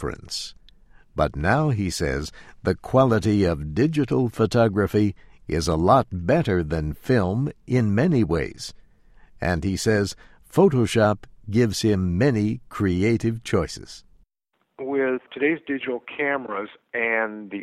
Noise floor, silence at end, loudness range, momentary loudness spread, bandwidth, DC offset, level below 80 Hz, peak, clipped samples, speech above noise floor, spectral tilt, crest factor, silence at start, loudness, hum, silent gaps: -73 dBFS; 0 s; 4 LU; 12 LU; 15 kHz; under 0.1%; -42 dBFS; -4 dBFS; under 0.1%; 51 dB; -6.5 dB/octave; 18 dB; 0 s; -23 LUFS; none; none